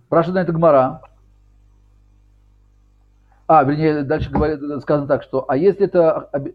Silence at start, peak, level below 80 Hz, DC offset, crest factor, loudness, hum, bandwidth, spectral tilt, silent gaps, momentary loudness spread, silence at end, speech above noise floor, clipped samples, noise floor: 0.1 s; -2 dBFS; -40 dBFS; under 0.1%; 16 dB; -17 LUFS; 50 Hz at -50 dBFS; 5.2 kHz; -10 dB/octave; none; 8 LU; 0.05 s; 37 dB; under 0.1%; -53 dBFS